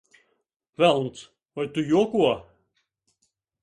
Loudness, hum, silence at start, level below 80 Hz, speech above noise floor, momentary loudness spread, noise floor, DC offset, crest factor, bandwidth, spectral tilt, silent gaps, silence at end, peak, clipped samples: -24 LUFS; none; 0.8 s; -64 dBFS; 52 dB; 20 LU; -74 dBFS; under 0.1%; 20 dB; 11 kHz; -6 dB/octave; none; 1.2 s; -6 dBFS; under 0.1%